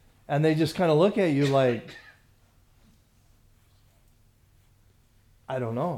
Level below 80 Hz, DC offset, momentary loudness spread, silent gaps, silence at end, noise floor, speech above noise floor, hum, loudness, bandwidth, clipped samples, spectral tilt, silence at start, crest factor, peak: -62 dBFS; under 0.1%; 13 LU; none; 0 s; -61 dBFS; 37 dB; none; -25 LUFS; 14.5 kHz; under 0.1%; -7 dB/octave; 0.3 s; 18 dB; -10 dBFS